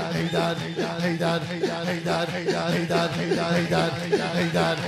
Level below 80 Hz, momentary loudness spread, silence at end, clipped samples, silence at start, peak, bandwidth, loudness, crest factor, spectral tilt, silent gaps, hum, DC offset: -54 dBFS; 4 LU; 0 s; under 0.1%; 0 s; -10 dBFS; 14.5 kHz; -25 LUFS; 16 dB; -5.5 dB/octave; none; none; under 0.1%